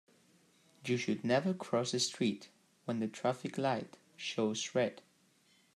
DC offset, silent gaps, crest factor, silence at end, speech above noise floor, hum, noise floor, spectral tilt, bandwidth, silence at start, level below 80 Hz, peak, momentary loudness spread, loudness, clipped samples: under 0.1%; none; 18 dB; 0.8 s; 35 dB; none; -70 dBFS; -4.5 dB/octave; 12.5 kHz; 0.85 s; -82 dBFS; -18 dBFS; 10 LU; -35 LUFS; under 0.1%